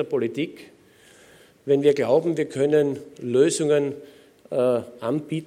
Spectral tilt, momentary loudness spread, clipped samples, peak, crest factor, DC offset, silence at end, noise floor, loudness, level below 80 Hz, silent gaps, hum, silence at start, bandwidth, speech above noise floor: -5.5 dB/octave; 11 LU; under 0.1%; -6 dBFS; 18 dB; under 0.1%; 0 s; -53 dBFS; -23 LUFS; -72 dBFS; none; none; 0 s; 13.5 kHz; 31 dB